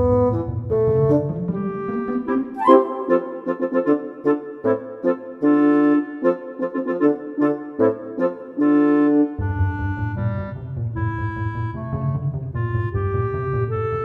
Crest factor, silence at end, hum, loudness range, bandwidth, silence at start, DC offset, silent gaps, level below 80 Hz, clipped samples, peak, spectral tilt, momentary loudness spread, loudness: 18 dB; 0 s; none; 5 LU; 4.1 kHz; 0 s; under 0.1%; none; -42 dBFS; under 0.1%; -2 dBFS; -11 dB/octave; 10 LU; -21 LUFS